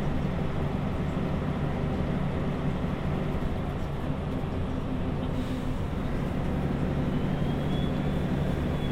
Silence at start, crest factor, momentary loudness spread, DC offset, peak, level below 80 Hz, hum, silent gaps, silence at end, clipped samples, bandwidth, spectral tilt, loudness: 0 s; 14 dB; 3 LU; under 0.1%; -14 dBFS; -36 dBFS; none; none; 0 s; under 0.1%; 13 kHz; -8 dB/octave; -30 LUFS